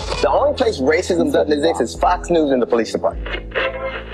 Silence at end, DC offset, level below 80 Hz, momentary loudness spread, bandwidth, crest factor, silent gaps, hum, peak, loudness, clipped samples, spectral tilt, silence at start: 0 s; under 0.1%; -34 dBFS; 6 LU; 13 kHz; 12 dB; none; none; -6 dBFS; -18 LUFS; under 0.1%; -5 dB/octave; 0 s